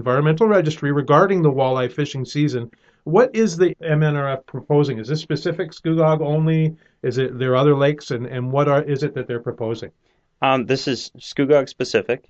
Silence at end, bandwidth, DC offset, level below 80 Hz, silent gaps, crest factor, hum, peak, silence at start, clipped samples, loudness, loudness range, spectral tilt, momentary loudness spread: 0.15 s; 7.8 kHz; under 0.1%; -58 dBFS; none; 18 dB; none; -2 dBFS; 0 s; under 0.1%; -20 LUFS; 3 LU; -7 dB/octave; 11 LU